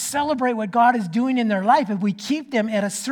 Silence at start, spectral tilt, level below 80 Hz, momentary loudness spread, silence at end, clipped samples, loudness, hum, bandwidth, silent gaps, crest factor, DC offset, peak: 0 s; -4.5 dB/octave; -64 dBFS; 6 LU; 0 s; under 0.1%; -21 LUFS; none; 18.5 kHz; none; 16 dB; under 0.1%; -4 dBFS